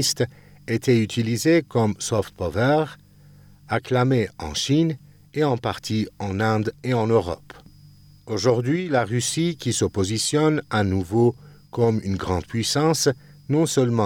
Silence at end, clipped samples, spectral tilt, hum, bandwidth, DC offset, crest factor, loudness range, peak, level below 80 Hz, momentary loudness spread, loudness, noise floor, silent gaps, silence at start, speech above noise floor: 0 s; under 0.1%; -5 dB/octave; none; 17.5 kHz; under 0.1%; 16 dB; 2 LU; -6 dBFS; -54 dBFS; 8 LU; -22 LUFS; -49 dBFS; none; 0 s; 28 dB